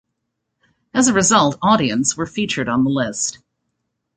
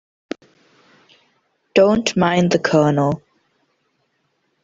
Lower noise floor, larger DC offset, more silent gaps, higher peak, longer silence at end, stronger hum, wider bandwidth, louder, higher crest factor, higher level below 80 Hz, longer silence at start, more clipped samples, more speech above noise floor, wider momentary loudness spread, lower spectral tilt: first, -76 dBFS vs -68 dBFS; neither; neither; about the same, -2 dBFS vs -2 dBFS; second, 0.85 s vs 1.45 s; neither; first, 9.6 kHz vs 7.8 kHz; about the same, -17 LUFS vs -17 LUFS; about the same, 18 dB vs 18 dB; about the same, -52 dBFS vs -54 dBFS; second, 0.95 s vs 1.75 s; neither; first, 59 dB vs 52 dB; second, 9 LU vs 19 LU; second, -3.5 dB/octave vs -6 dB/octave